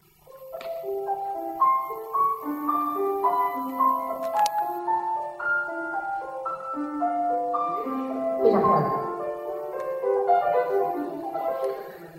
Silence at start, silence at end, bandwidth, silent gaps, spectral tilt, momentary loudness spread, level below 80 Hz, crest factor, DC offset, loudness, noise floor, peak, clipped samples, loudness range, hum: 0.3 s; 0 s; 16 kHz; none; -6.5 dB/octave; 10 LU; -66 dBFS; 20 dB; under 0.1%; -26 LUFS; -47 dBFS; -6 dBFS; under 0.1%; 3 LU; none